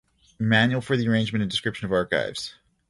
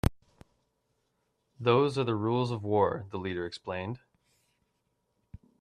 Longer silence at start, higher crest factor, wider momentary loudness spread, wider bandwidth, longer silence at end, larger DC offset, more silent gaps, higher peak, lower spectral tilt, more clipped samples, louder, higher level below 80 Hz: first, 0.4 s vs 0.05 s; about the same, 20 dB vs 24 dB; about the same, 10 LU vs 11 LU; second, 11.5 kHz vs 13.5 kHz; second, 0.4 s vs 1.65 s; neither; neither; first, -4 dBFS vs -8 dBFS; second, -5.5 dB/octave vs -7 dB/octave; neither; first, -24 LUFS vs -30 LUFS; about the same, -54 dBFS vs -50 dBFS